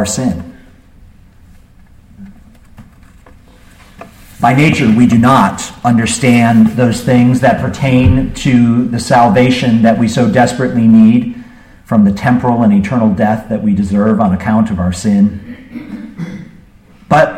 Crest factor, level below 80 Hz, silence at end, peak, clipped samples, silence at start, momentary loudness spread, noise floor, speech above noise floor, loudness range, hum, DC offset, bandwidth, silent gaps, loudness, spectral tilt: 12 dB; -34 dBFS; 0 s; 0 dBFS; under 0.1%; 0 s; 16 LU; -41 dBFS; 31 dB; 5 LU; none; under 0.1%; 14 kHz; none; -10 LUFS; -6.5 dB/octave